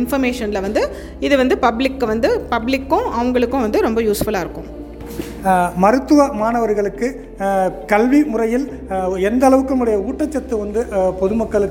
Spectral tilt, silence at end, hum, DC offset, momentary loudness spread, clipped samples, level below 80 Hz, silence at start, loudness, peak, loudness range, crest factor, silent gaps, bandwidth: -6 dB/octave; 0 s; none; under 0.1%; 10 LU; under 0.1%; -36 dBFS; 0 s; -17 LUFS; 0 dBFS; 2 LU; 16 dB; none; 17 kHz